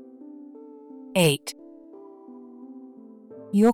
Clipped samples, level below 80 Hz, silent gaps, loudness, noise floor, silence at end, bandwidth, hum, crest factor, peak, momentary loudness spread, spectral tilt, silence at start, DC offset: under 0.1%; -68 dBFS; none; -24 LUFS; -46 dBFS; 0 s; 19.5 kHz; none; 18 dB; -10 dBFS; 25 LU; -5 dB/octave; 1.15 s; under 0.1%